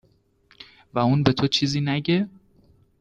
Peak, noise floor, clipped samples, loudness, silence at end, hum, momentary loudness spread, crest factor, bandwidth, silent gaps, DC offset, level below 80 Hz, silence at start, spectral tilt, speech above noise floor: -2 dBFS; -61 dBFS; under 0.1%; -22 LUFS; 0.7 s; none; 7 LU; 22 dB; 8.8 kHz; none; under 0.1%; -54 dBFS; 0.6 s; -6 dB/octave; 40 dB